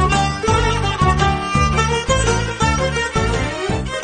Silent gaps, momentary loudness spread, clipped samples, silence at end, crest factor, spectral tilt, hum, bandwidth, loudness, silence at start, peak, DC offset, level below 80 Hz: none; 4 LU; under 0.1%; 0 s; 14 dB; -4.5 dB/octave; none; 9.6 kHz; -17 LUFS; 0 s; -2 dBFS; under 0.1%; -24 dBFS